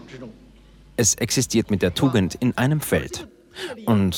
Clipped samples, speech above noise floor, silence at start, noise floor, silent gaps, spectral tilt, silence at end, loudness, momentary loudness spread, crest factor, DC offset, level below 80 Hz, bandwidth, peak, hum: under 0.1%; 27 dB; 0 s; -49 dBFS; none; -4.5 dB/octave; 0 s; -21 LUFS; 18 LU; 16 dB; under 0.1%; -48 dBFS; 19 kHz; -6 dBFS; none